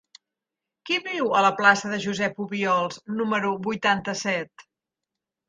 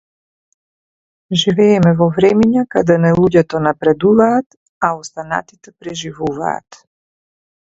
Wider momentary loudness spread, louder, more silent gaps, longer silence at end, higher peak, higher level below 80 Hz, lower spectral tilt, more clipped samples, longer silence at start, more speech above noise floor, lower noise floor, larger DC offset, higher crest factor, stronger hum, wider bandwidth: second, 9 LU vs 13 LU; second, -24 LUFS vs -14 LUFS; second, none vs 4.46-4.50 s, 4.57-4.81 s; about the same, 0.9 s vs 0.95 s; second, -4 dBFS vs 0 dBFS; second, -68 dBFS vs -48 dBFS; second, -4 dB/octave vs -6.5 dB/octave; neither; second, 0.85 s vs 1.3 s; second, 63 dB vs over 76 dB; about the same, -87 dBFS vs under -90 dBFS; neither; first, 22 dB vs 16 dB; neither; first, 9.6 kHz vs 8 kHz